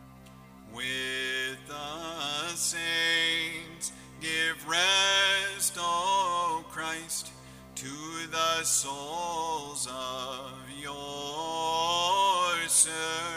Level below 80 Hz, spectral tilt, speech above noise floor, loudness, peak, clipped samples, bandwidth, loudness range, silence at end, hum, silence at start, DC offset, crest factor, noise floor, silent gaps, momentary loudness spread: -62 dBFS; -0.5 dB/octave; 17 dB; -28 LUFS; -10 dBFS; under 0.1%; 16 kHz; 5 LU; 0 s; none; 0 s; under 0.1%; 22 dB; -51 dBFS; none; 15 LU